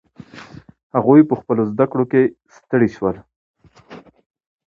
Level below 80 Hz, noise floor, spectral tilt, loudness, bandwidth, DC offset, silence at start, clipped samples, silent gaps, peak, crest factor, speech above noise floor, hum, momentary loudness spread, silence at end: -56 dBFS; -42 dBFS; -9.5 dB/octave; -17 LUFS; 6.8 kHz; under 0.1%; 0.35 s; under 0.1%; 0.83-0.90 s, 3.36-3.54 s; 0 dBFS; 18 dB; 26 dB; none; 23 LU; 0.7 s